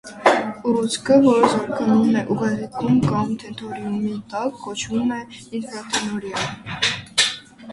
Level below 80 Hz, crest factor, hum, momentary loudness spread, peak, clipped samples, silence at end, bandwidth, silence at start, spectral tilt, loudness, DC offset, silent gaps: -54 dBFS; 20 dB; none; 13 LU; 0 dBFS; under 0.1%; 0 s; 11.5 kHz; 0.05 s; -4.5 dB/octave; -21 LUFS; under 0.1%; none